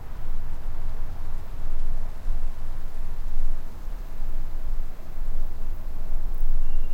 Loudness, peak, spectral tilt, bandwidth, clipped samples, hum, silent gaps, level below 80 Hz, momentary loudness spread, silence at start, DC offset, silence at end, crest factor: -36 LUFS; -8 dBFS; -6.5 dB/octave; 1.8 kHz; under 0.1%; none; none; -24 dBFS; 6 LU; 0 s; under 0.1%; 0 s; 10 dB